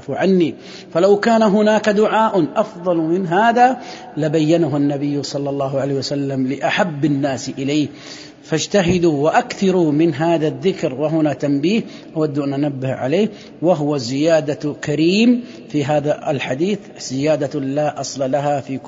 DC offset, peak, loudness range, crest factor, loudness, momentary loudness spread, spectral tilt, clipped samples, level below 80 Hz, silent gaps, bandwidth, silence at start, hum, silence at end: under 0.1%; -2 dBFS; 4 LU; 16 dB; -18 LUFS; 8 LU; -6 dB/octave; under 0.1%; -54 dBFS; none; 7.8 kHz; 0 s; none; 0 s